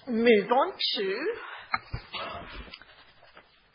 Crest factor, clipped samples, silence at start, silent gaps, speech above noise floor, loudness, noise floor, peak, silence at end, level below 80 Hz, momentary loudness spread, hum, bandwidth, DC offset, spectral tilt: 20 dB; under 0.1%; 0.05 s; none; 29 dB; -28 LUFS; -57 dBFS; -10 dBFS; 1 s; -52 dBFS; 21 LU; none; 5.4 kHz; under 0.1%; -8.5 dB/octave